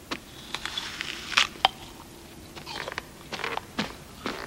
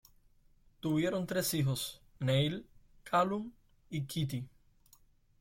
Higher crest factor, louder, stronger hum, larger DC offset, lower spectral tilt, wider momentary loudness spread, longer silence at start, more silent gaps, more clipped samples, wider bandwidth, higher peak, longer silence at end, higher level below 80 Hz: first, 32 dB vs 18 dB; first, -30 LUFS vs -34 LUFS; neither; neither; second, -2 dB/octave vs -5.5 dB/octave; first, 20 LU vs 12 LU; second, 0 s vs 0.85 s; neither; neither; about the same, 16 kHz vs 16.5 kHz; first, 0 dBFS vs -18 dBFS; second, 0 s vs 0.95 s; first, -54 dBFS vs -64 dBFS